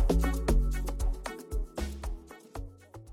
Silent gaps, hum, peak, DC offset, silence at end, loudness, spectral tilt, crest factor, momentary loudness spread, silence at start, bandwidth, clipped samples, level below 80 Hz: none; none; -16 dBFS; under 0.1%; 0 s; -33 LUFS; -6 dB/octave; 16 dB; 17 LU; 0 s; 15.5 kHz; under 0.1%; -32 dBFS